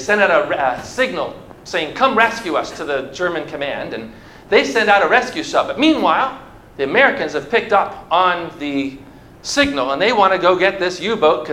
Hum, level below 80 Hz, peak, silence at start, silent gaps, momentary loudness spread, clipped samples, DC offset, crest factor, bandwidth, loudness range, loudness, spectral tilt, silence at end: none; -48 dBFS; 0 dBFS; 0 s; none; 11 LU; under 0.1%; under 0.1%; 18 dB; 15 kHz; 4 LU; -16 LUFS; -3.5 dB/octave; 0 s